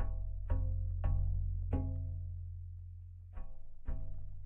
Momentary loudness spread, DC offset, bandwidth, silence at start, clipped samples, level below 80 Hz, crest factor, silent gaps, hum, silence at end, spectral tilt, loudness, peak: 15 LU; under 0.1%; 2.9 kHz; 0 s; under 0.1%; -40 dBFS; 14 dB; none; none; 0 s; -11 dB/octave; -41 LUFS; -22 dBFS